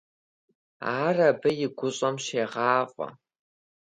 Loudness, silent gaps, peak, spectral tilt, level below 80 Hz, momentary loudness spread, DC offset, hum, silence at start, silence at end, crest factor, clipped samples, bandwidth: -26 LUFS; none; -8 dBFS; -4.5 dB/octave; -74 dBFS; 12 LU; under 0.1%; none; 0.8 s; 0.85 s; 20 dB; under 0.1%; 10.5 kHz